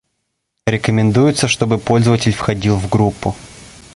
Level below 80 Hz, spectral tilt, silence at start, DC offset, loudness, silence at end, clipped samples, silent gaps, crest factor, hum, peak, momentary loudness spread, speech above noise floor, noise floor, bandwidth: -38 dBFS; -5.5 dB/octave; 0.65 s; under 0.1%; -15 LUFS; 0.25 s; under 0.1%; none; 14 dB; none; -2 dBFS; 11 LU; 58 dB; -72 dBFS; 11.5 kHz